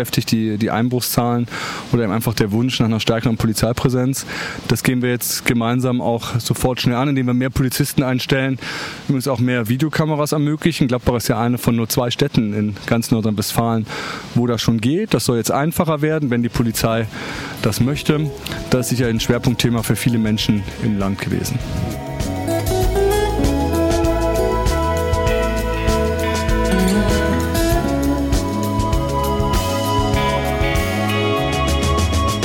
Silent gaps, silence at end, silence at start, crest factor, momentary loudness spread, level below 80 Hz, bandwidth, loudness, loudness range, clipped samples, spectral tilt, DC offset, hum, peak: none; 0 s; 0 s; 16 dB; 4 LU; -28 dBFS; 17 kHz; -18 LUFS; 1 LU; under 0.1%; -5.5 dB/octave; under 0.1%; none; -2 dBFS